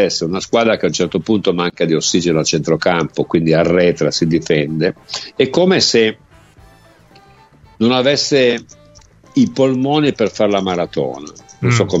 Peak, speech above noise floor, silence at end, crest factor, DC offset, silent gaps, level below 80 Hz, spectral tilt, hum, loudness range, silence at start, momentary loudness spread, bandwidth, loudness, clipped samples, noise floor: 0 dBFS; 31 dB; 0 s; 16 dB; under 0.1%; none; -48 dBFS; -4.5 dB/octave; none; 3 LU; 0 s; 7 LU; 8.2 kHz; -15 LUFS; under 0.1%; -46 dBFS